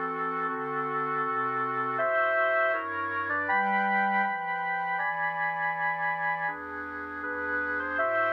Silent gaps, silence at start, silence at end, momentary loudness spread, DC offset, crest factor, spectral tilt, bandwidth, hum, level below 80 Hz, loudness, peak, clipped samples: none; 0 s; 0 s; 6 LU; under 0.1%; 14 dB; -7 dB/octave; 6.2 kHz; 50 Hz at -75 dBFS; -68 dBFS; -28 LUFS; -14 dBFS; under 0.1%